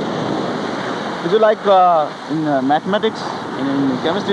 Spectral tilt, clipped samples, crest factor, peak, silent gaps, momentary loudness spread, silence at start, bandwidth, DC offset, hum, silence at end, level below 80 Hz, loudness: -6 dB/octave; under 0.1%; 14 dB; -2 dBFS; none; 10 LU; 0 s; 10.5 kHz; under 0.1%; none; 0 s; -60 dBFS; -17 LUFS